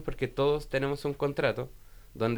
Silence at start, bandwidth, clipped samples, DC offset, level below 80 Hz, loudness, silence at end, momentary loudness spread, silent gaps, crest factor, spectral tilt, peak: 0 s; over 20 kHz; under 0.1%; under 0.1%; -48 dBFS; -30 LUFS; 0 s; 7 LU; none; 16 dB; -6.5 dB/octave; -14 dBFS